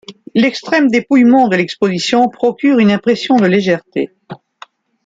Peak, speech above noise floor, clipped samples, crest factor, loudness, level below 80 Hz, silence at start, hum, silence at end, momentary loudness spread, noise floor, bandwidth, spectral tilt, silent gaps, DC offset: -2 dBFS; 29 dB; under 0.1%; 12 dB; -13 LUFS; -58 dBFS; 0.1 s; none; 0.7 s; 9 LU; -41 dBFS; 8 kHz; -6 dB/octave; none; under 0.1%